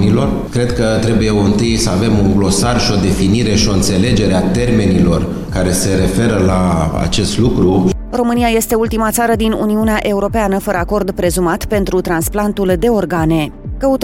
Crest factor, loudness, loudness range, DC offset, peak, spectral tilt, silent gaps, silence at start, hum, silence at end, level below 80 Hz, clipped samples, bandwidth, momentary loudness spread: 12 dB; -14 LUFS; 2 LU; under 0.1%; 0 dBFS; -5.5 dB/octave; none; 0 s; none; 0 s; -26 dBFS; under 0.1%; 16.5 kHz; 4 LU